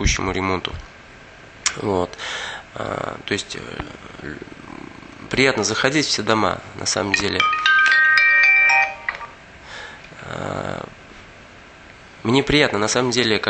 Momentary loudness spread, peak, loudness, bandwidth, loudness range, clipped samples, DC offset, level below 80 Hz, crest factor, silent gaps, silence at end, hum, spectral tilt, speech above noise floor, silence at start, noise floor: 24 LU; 0 dBFS; -18 LUFS; 9.4 kHz; 13 LU; under 0.1%; under 0.1%; -40 dBFS; 20 dB; none; 0 s; none; -3 dB/octave; 22 dB; 0 s; -43 dBFS